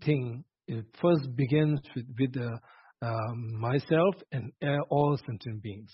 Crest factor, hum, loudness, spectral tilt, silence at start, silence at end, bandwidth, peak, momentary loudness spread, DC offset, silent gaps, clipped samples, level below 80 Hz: 18 dB; none; -30 LUFS; -11.5 dB/octave; 0 s; 0.1 s; 5.8 kHz; -12 dBFS; 13 LU; under 0.1%; none; under 0.1%; -64 dBFS